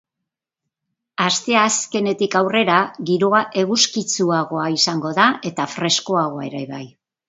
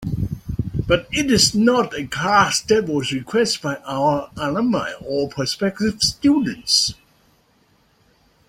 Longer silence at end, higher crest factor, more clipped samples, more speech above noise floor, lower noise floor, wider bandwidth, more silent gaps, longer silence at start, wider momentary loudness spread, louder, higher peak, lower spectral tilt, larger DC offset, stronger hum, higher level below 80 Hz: second, 0.4 s vs 1.55 s; about the same, 20 dB vs 18 dB; neither; first, 64 dB vs 40 dB; first, -82 dBFS vs -59 dBFS; second, 8 kHz vs 16.5 kHz; neither; first, 1.2 s vs 0 s; about the same, 9 LU vs 10 LU; about the same, -18 LUFS vs -19 LUFS; about the same, 0 dBFS vs -2 dBFS; about the same, -3 dB/octave vs -4 dB/octave; neither; neither; second, -66 dBFS vs -42 dBFS